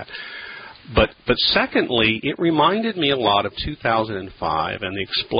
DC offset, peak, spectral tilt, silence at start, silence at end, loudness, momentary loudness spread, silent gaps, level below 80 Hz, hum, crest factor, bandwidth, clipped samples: under 0.1%; -2 dBFS; -10 dB/octave; 0 s; 0 s; -20 LUFS; 15 LU; none; -40 dBFS; none; 18 dB; 5.4 kHz; under 0.1%